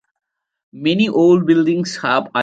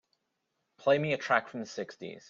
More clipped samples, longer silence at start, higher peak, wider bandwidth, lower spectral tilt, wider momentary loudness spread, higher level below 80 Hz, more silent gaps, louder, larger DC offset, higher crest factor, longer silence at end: neither; about the same, 0.75 s vs 0.8 s; first, -2 dBFS vs -10 dBFS; first, 8.8 kHz vs 7.4 kHz; about the same, -6 dB/octave vs -5 dB/octave; second, 7 LU vs 12 LU; first, -62 dBFS vs -76 dBFS; neither; first, -15 LUFS vs -30 LUFS; neither; second, 14 dB vs 22 dB; about the same, 0 s vs 0.1 s